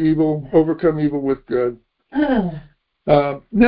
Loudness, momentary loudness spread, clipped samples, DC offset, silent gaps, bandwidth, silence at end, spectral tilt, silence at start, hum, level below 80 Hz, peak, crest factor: -19 LUFS; 10 LU; under 0.1%; under 0.1%; none; 5.2 kHz; 0 s; -12.5 dB/octave; 0 s; none; -44 dBFS; 0 dBFS; 18 dB